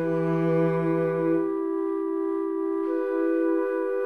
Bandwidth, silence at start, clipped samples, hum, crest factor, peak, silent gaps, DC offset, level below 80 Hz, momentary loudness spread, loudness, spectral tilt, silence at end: 4.5 kHz; 0 s; under 0.1%; none; 12 dB; -12 dBFS; none; 0.2%; -72 dBFS; 4 LU; -26 LUFS; -10 dB/octave; 0 s